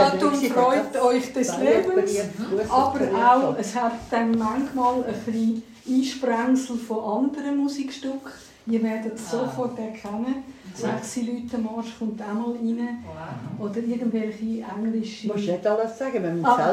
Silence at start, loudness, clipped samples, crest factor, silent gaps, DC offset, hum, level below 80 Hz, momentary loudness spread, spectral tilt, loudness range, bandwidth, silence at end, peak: 0 s; -24 LUFS; under 0.1%; 20 dB; none; under 0.1%; none; -60 dBFS; 11 LU; -5.5 dB/octave; 8 LU; 15 kHz; 0 s; -4 dBFS